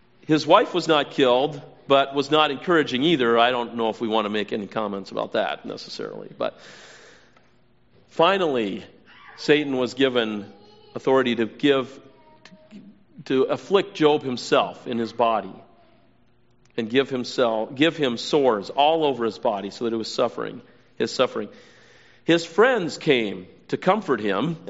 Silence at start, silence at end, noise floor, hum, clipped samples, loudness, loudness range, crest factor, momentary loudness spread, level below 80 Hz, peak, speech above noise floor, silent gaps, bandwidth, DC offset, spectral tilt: 0.3 s; 0 s; -61 dBFS; none; under 0.1%; -22 LUFS; 6 LU; 22 dB; 13 LU; -68 dBFS; -2 dBFS; 39 dB; none; 8 kHz; 0.1%; -3 dB/octave